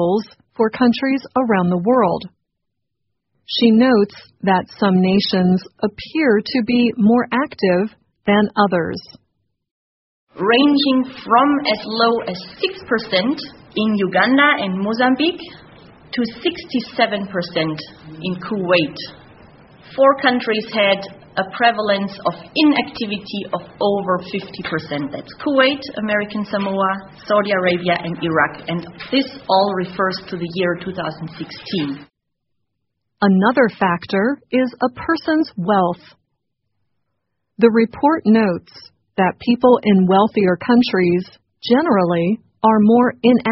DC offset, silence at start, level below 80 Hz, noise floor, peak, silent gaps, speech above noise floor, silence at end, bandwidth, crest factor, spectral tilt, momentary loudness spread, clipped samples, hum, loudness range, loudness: under 0.1%; 0 s; -56 dBFS; -77 dBFS; 0 dBFS; 9.71-10.27 s; 60 dB; 0 s; 6 kHz; 18 dB; -4 dB/octave; 12 LU; under 0.1%; none; 5 LU; -17 LUFS